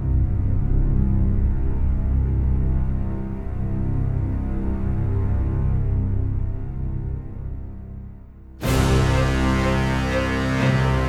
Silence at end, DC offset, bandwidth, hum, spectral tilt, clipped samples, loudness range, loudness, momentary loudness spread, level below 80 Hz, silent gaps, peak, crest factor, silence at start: 0 s; under 0.1%; 14.5 kHz; none; -7 dB/octave; under 0.1%; 4 LU; -23 LUFS; 11 LU; -24 dBFS; none; -6 dBFS; 14 dB; 0 s